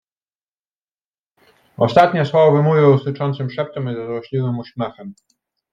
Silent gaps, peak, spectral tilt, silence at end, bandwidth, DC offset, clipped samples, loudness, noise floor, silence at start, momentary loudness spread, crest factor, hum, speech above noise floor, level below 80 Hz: none; -2 dBFS; -8.5 dB/octave; 0.6 s; 7.4 kHz; under 0.1%; under 0.1%; -17 LUFS; under -90 dBFS; 1.8 s; 14 LU; 18 dB; none; over 73 dB; -60 dBFS